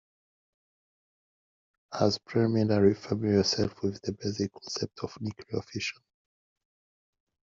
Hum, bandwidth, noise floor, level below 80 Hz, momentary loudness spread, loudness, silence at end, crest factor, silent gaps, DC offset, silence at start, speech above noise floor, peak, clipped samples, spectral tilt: none; 7.6 kHz; under -90 dBFS; -64 dBFS; 12 LU; -29 LUFS; 1.6 s; 22 dB; none; under 0.1%; 1.9 s; over 61 dB; -10 dBFS; under 0.1%; -5.5 dB/octave